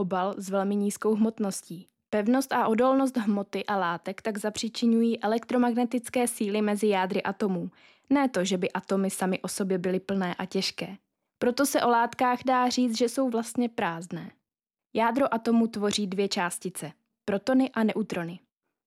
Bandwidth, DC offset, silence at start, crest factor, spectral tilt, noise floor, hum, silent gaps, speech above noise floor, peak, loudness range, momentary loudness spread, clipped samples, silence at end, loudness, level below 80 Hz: 16 kHz; under 0.1%; 0 s; 14 dB; -5 dB/octave; under -90 dBFS; none; none; over 63 dB; -12 dBFS; 2 LU; 10 LU; under 0.1%; 0.5 s; -27 LUFS; -72 dBFS